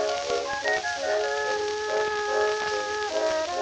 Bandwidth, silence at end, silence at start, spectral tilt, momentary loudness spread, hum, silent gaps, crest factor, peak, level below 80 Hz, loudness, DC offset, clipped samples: 9.4 kHz; 0 s; 0 s; -1.5 dB/octave; 3 LU; none; none; 16 dB; -12 dBFS; -60 dBFS; -26 LUFS; under 0.1%; under 0.1%